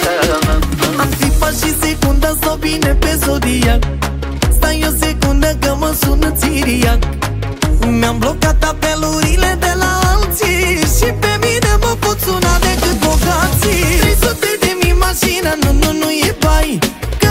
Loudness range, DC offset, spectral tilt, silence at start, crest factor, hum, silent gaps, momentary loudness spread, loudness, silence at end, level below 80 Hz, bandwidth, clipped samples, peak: 2 LU; under 0.1%; -4 dB/octave; 0 s; 12 dB; none; none; 3 LU; -13 LUFS; 0 s; -16 dBFS; 16.5 kHz; under 0.1%; 0 dBFS